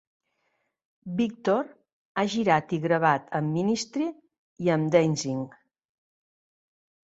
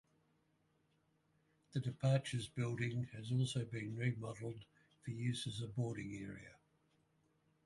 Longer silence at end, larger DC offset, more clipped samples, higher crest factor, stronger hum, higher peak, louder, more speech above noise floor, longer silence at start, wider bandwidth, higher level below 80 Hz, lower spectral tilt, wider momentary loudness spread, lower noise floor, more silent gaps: first, 1.6 s vs 1.1 s; neither; neither; about the same, 22 dB vs 20 dB; neither; first, -6 dBFS vs -22 dBFS; first, -26 LUFS vs -42 LUFS; first, 50 dB vs 38 dB; second, 1.05 s vs 1.75 s; second, 8.2 kHz vs 11.5 kHz; about the same, -68 dBFS vs -72 dBFS; about the same, -6 dB/octave vs -6 dB/octave; about the same, 11 LU vs 12 LU; second, -75 dBFS vs -79 dBFS; first, 1.93-2.15 s, 4.38-4.56 s vs none